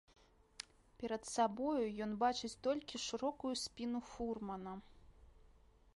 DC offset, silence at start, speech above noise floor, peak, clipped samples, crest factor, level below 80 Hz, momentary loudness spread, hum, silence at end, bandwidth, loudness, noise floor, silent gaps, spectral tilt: under 0.1%; 0.6 s; 26 dB; -22 dBFS; under 0.1%; 20 dB; -66 dBFS; 15 LU; none; 0.5 s; 11.5 kHz; -41 LUFS; -66 dBFS; none; -4 dB/octave